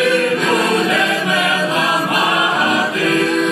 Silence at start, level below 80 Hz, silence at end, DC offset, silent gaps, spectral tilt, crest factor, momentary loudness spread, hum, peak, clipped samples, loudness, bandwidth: 0 s; -64 dBFS; 0 s; under 0.1%; none; -3.5 dB/octave; 12 dB; 1 LU; none; -2 dBFS; under 0.1%; -15 LUFS; 14.5 kHz